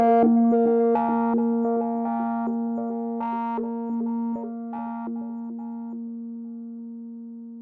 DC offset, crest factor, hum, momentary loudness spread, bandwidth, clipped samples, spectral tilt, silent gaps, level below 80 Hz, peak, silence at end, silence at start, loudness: under 0.1%; 14 dB; none; 18 LU; 3.2 kHz; under 0.1%; -11 dB/octave; none; -70 dBFS; -10 dBFS; 0 s; 0 s; -25 LUFS